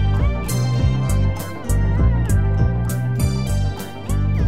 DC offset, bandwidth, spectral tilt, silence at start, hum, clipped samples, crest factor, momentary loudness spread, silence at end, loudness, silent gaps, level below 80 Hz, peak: 2%; 16 kHz; -6.5 dB/octave; 0 s; none; under 0.1%; 14 dB; 5 LU; 0 s; -20 LUFS; none; -22 dBFS; -4 dBFS